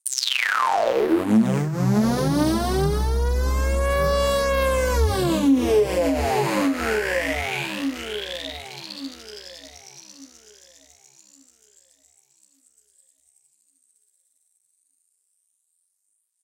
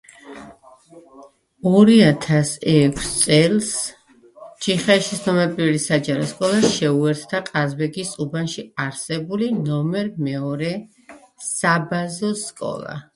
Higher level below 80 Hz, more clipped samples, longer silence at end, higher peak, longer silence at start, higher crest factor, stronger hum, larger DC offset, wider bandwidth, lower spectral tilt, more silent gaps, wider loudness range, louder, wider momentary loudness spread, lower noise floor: first, -32 dBFS vs -52 dBFS; neither; first, 6.2 s vs 0.15 s; second, -6 dBFS vs 0 dBFS; second, 0.05 s vs 0.25 s; about the same, 18 dB vs 20 dB; neither; neither; first, 17 kHz vs 11.5 kHz; about the same, -5 dB/octave vs -5 dB/octave; neither; first, 17 LU vs 7 LU; second, -22 LUFS vs -19 LUFS; first, 17 LU vs 12 LU; first, -74 dBFS vs -47 dBFS